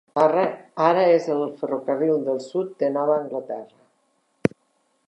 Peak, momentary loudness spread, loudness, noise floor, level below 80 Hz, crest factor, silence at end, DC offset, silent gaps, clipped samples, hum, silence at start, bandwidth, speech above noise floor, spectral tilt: -2 dBFS; 10 LU; -22 LUFS; -68 dBFS; -66 dBFS; 22 dB; 0.6 s; under 0.1%; none; under 0.1%; none; 0.15 s; 10.5 kHz; 46 dB; -7 dB/octave